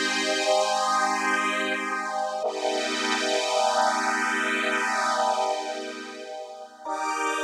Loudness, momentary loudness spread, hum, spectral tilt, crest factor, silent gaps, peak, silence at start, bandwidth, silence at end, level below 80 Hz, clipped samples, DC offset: -25 LUFS; 13 LU; none; -1 dB/octave; 18 dB; none; -8 dBFS; 0 s; 15.5 kHz; 0 s; -88 dBFS; under 0.1%; under 0.1%